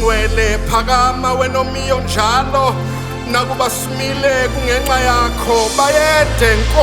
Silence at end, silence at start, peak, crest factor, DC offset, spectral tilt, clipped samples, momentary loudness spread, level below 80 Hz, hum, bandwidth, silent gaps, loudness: 0 s; 0 s; 0 dBFS; 14 dB; under 0.1%; -4 dB/octave; under 0.1%; 6 LU; -22 dBFS; none; 19.5 kHz; none; -14 LUFS